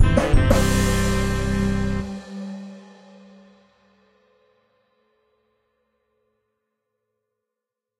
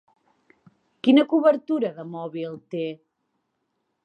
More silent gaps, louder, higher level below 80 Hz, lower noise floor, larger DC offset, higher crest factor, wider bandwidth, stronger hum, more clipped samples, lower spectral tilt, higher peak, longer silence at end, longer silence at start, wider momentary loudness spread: neither; about the same, -22 LUFS vs -23 LUFS; first, -28 dBFS vs -82 dBFS; first, -85 dBFS vs -76 dBFS; neither; about the same, 22 dB vs 20 dB; first, 16 kHz vs 5.4 kHz; neither; neither; second, -5.5 dB/octave vs -7.5 dB/octave; first, -2 dBFS vs -6 dBFS; first, 5.2 s vs 1.1 s; second, 0 s vs 1.05 s; about the same, 17 LU vs 15 LU